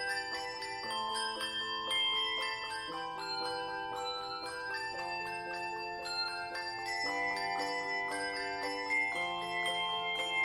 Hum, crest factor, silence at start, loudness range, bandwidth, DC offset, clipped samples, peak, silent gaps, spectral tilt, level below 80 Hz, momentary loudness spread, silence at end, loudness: none; 14 dB; 0 s; 4 LU; 16 kHz; under 0.1%; under 0.1%; -22 dBFS; none; -1.5 dB/octave; -68 dBFS; 7 LU; 0 s; -35 LUFS